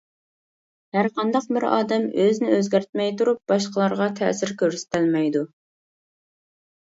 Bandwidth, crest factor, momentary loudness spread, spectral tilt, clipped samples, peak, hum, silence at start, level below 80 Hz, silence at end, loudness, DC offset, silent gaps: 8 kHz; 18 dB; 4 LU; -5.5 dB/octave; under 0.1%; -6 dBFS; none; 0.95 s; -70 dBFS; 1.4 s; -22 LUFS; under 0.1%; 2.89-2.93 s